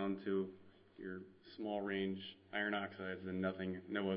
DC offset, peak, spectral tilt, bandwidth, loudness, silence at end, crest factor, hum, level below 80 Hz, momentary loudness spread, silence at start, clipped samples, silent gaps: under 0.1%; -24 dBFS; -4.5 dB/octave; 5.4 kHz; -43 LUFS; 0 s; 18 dB; none; -80 dBFS; 11 LU; 0 s; under 0.1%; none